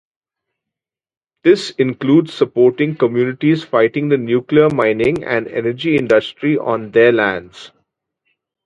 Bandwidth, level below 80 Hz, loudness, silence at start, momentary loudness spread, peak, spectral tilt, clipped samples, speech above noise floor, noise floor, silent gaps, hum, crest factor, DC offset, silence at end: 9.4 kHz; -54 dBFS; -15 LUFS; 1.45 s; 6 LU; 0 dBFS; -7 dB/octave; under 0.1%; 70 dB; -85 dBFS; none; none; 16 dB; under 0.1%; 1 s